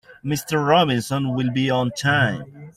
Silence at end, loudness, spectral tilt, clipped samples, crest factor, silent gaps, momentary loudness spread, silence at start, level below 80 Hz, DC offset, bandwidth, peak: 0.05 s; -20 LUFS; -5.5 dB/octave; under 0.1%; 16 dB; none; 9 LU; 0.1 s; -54 dBFS; under 0.1%; 16 kHz; -4 dBFS